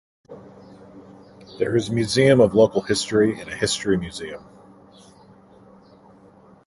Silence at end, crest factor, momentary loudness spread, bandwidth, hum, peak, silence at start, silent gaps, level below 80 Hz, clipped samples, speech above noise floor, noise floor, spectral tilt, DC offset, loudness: 2.25 s; 20 dB; 19 LU; 11.5 kHz; none; -2 dBFS; 0.3 s; none; -52 dBFS; under 0.1%; 31 dB; -50 dBFS; -5 dB/octave; under 0.1%; -20 LUFS